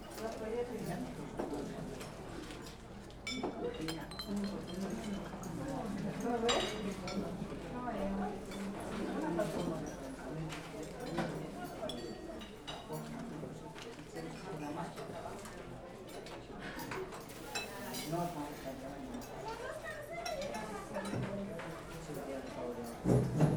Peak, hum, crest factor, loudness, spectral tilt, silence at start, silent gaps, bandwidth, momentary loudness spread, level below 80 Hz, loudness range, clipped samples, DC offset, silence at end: -16 dBFS; none; 26 dB; -41 LUFS; -5.5 dB/octave; 0 s; none; over 20 kHz; 10 LU; -56 dBFS; 7 LU; under 0.1%; under 0.1%; 0 s